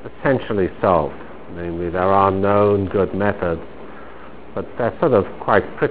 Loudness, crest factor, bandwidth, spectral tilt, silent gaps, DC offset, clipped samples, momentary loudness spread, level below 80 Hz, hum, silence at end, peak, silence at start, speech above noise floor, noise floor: -19 LUFS; 20 dB; 4 kHz; -11 dB/octave; none; 2%; under 0.1%; 21 LU; -40 dBFS; none; 0 s; 0 dBFS; 0.05 s; 21 dB; -39 dBFS